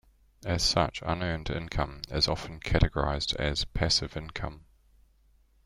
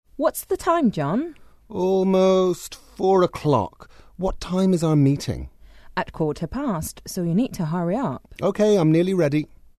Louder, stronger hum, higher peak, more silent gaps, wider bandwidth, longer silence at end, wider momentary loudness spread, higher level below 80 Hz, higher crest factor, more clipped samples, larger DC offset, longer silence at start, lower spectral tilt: second, -29 LUFS vs -22 LUFS; neither; about the same, -6 dBFS vs -6 dBFS; neither; about the same, 13 kHz vs 13.5 kHz; first, 1.05 s vs 0.35 s; about the same, 11 LU vs 12 LU; first, -38 dBFS vs -44 dBFS; first, 24 dB vs 16 dB; neither; neither; first, 0.4 s vs 0.15 s; second, -4 dB/octave vs -7 dB/octave